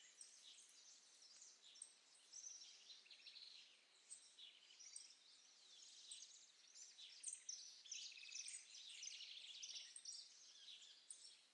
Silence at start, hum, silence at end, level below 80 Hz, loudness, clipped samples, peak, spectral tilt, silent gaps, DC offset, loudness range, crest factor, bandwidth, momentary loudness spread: 0 s; none; 0 s; under -90 dBFS; -58 LUFS; under 0.1%; -38 dBFS; 4.5 dB/octave; none; under 0.1%; 7 LU; 22 dB; 11 kHz; 12 LU